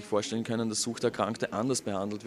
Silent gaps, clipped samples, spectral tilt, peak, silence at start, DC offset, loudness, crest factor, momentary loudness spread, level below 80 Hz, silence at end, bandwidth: none; under 0.1%; -4 dB/octave; -12 dBFS; 0 s; under 0.1%; -31 LUFS; 18 dB; 2 LU; -70 dBFS; 0 s; 14 kHz